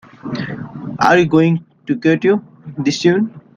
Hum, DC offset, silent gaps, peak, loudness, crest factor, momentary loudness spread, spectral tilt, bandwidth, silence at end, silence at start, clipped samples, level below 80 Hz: none; under 0.1%; none; 0 dBFS; -16 LUFS; 16 dB; 15 LU; -6.5 dB/octave; 7.6 kHz; 0.2 s; 0.25 s; under 0.1%; -54 dBFS